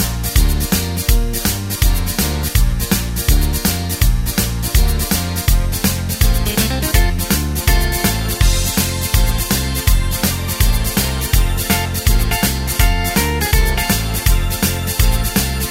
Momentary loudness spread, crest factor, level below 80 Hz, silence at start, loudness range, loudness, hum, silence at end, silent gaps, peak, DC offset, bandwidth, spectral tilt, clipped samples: 2 LU; 14 dB; -18 dBFS; 0 s; 1 LU; -16 LUFS; none; 0 s; none; 0 dBFS; under 0.1%; 16.5 kHz; -4 dB/octave; under 0.1%